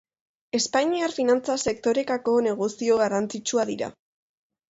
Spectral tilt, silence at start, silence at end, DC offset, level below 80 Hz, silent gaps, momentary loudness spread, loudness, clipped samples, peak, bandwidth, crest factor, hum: -3.5 dB/octave; 0.55 s; 0.8 s; under 0.1%; -64 dBFS; none; 5 LU; -24 LUFS; under 0.1%; -10 dBFS; 8 kHz; 16 dB; none